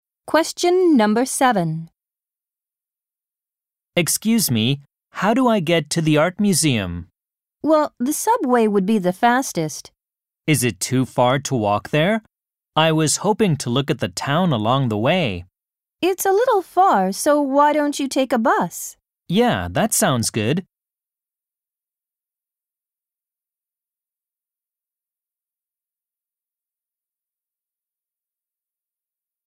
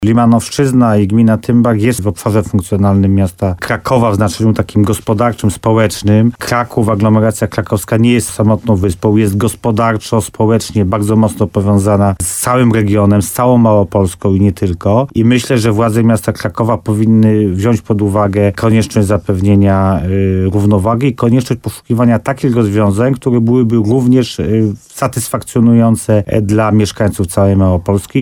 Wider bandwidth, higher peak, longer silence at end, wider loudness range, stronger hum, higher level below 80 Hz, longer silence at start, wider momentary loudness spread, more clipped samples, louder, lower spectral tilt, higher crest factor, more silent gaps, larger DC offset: about the same, 16 kHz vs 17.5 kHz; about the same, -2 dBFS vs 0 dBFS; first, 8.85 s vs 0 s; first, 5 LU vs 1 LU; neither; second, -56 dBFS vs -36 dBFS; first, 0.25 s vs 0 s; first, 8 LU vs 5 LU; neither; second, -19 LUFS vs -12 LUFS; second, -4.5 dB/octave vs -7 dB/octave; first, 18 dB vs 10 dB; neither; neither